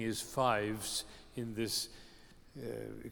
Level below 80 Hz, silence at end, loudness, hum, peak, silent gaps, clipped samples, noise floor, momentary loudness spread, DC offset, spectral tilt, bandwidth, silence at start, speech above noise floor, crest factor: -60 dBFS; 0 s; -37 LUFS; none; -18 dBFS; none; under 0.1%; -58 dBFS; 15 LU; under 0.1%; -3.5 dB/octave; over 20 kHz; 0 s; 20 dB; 20 dB